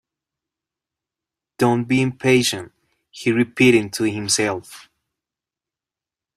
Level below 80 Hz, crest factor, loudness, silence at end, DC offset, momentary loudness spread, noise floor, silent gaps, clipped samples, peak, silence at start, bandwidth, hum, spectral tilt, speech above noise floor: -60 dBFS; 20 dB; -18 LUFS; 1.55 s; under 0.1%; 9 LU; -89 dBFS; none; under 0.1%; -2 dBFS; 1.6 s; 15.5 kHz; none; -4.5 dB/octave; 71 dB